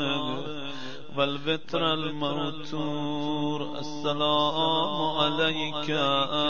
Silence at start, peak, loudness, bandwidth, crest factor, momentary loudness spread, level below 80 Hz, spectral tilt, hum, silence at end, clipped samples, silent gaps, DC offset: 0 s; -10 dBFS; -27 LUFS; 7.2 kHz; 18 dB; 10 LU; -64 dBFS; -5.5 dB/octave; none; 0 s; under 0.1%; none; 2%